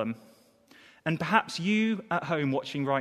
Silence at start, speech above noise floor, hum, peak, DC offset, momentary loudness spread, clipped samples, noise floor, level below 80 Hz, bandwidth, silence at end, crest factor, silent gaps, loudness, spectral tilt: 0 s; 30 dB; none; -6 dBFS; under 0.1%; 9 LU; under 0.1%; -59 dBFS; -70 dBFS; 13 kHz; 0 s; 24 dB; none; -29 LUFS; -6 dB/octave